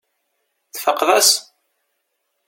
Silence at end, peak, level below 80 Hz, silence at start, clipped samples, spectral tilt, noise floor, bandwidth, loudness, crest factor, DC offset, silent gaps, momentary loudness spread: 1.05 s; 0 dBFS; -72 dBFS; 0.75 s; under 0.1%; 1.5 dB/octave; -73 dBFS; 17 kHz; -15 LUFS; 20 dB; under 0.1%; none; 11 LU